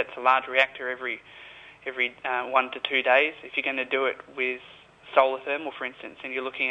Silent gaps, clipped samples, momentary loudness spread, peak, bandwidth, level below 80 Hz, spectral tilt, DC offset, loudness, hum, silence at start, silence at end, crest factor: none; under 0.1%; 15 LU; -6 dBFS; 8.4 kHz; -72 dBFS; -3.5 dB/octave; under 0.1%; -26 LUFS; none; 0 s; 0 s; 22 dB